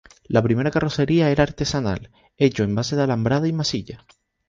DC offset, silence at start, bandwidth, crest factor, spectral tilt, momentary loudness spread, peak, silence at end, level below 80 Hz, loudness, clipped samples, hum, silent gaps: under 0.1%; 0.3 s; 7.6 kHz; 18 dB; -6 dB/octave; 7 LU; -4 dBFS; 0.5 s; -44 dBFS; -21 LUFS; under 0.1%; none; none